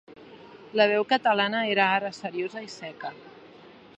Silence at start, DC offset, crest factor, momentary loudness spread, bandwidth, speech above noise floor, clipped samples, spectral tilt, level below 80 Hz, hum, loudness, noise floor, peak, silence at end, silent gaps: 0.1 s; under 0.1%; 22 dB; 16 LU; 8.4 kHz; 25 dB; under 0.1%; -4.5 dB/octave; -78 dBFS; none; -25 LUFS; -50 dBFS; -6 dBFS; 0.3 s; none